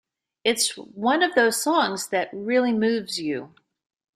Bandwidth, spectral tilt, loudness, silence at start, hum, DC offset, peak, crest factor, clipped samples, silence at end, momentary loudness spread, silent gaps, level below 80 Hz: 16 kHz; -2.5 dB/octave; -23 LUFS; 0.45 s; none; under 0.1%; -6 dBFS; 18 dB; under 0.1%; 0.7 s; 8 LU; none; -70 dBFS